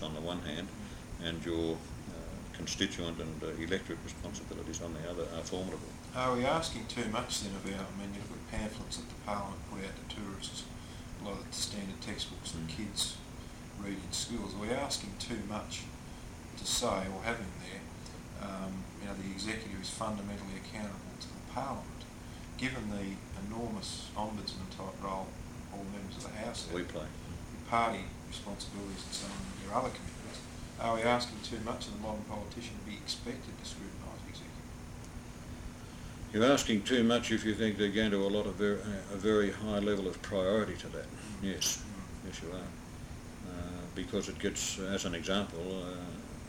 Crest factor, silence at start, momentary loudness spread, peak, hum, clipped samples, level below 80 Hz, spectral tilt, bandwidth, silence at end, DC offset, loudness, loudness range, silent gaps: 24 dB; 0 s; 15 LU; -14 dBFS; none; under 0.1%; -52 dBFS; -4 dB/octave; 18 kHz; 0 s; under 0.1%; -37 LUFS; 9 LU; none